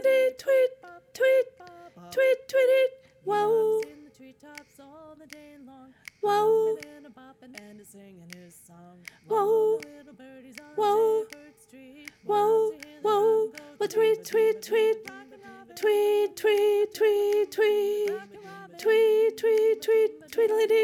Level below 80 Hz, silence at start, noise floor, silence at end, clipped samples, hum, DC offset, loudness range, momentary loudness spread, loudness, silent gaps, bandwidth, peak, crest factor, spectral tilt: -76 dBFS; 0 s; -51 dBFS; 0 s; under 0.1%; none; under 0.1%; 6 LU; 22 LU; -25 LUFS; none; 16 kHz; -14 dBFS; 12 dB; -3.5 dB/octave